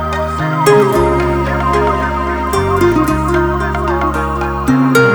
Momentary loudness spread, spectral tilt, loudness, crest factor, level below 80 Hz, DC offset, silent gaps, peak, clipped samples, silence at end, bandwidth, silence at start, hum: 7 LU; -6.5 dB/octave; -13 LUFS; 12 dB; -24 dBFS; under 0.1%; none; 0 dBFS; under 0.1%; 0 s; over 20 kHz; 0 s; none